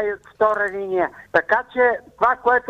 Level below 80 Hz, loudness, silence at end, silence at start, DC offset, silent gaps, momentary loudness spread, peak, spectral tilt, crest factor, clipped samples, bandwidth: -56 dBFS; -20 LUFS; 0 s; 0 s; under 0.1%; none; 5 LU; -4 dBFS; -6 dB/octave; 16 dB; under 0.1%; 8.8 kHz